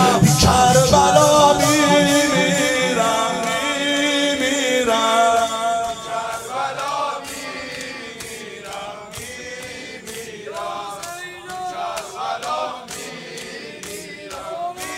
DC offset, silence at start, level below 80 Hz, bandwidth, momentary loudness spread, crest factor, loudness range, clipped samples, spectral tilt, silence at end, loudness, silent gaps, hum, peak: under 0.1%; 0 s; -42 dBFS; 16 kHz; 18 LU; 18 dB; 16 LU; under 0.1%; -3.5 dB/octave; 0 s; -18 LUFS; none; none; 0 dBFS